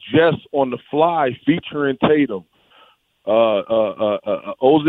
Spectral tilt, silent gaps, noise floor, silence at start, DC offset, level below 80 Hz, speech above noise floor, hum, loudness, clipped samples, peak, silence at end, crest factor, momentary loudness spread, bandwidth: -9 dB/octave; none; -53 dBFS; 0.05 s; under 0.1%; -56 dBFS; 36 dB; none; -18 LUFS; under 0.1%; -2 dBFS; 0 s; 16 dB; 7 LU; 4.1 kHz